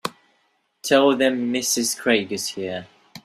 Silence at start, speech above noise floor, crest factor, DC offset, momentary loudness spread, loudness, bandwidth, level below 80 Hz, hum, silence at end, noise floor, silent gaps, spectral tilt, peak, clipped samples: 0.05 s; 46 dB; 20 dB; under 0.1%; 15 LU; -21 LUFS; 16 kHz; -66 dBFS; none; 0.05 s; -67 dBFS; none; -2.5 dB/octave; -2 dBFS; under 0.1%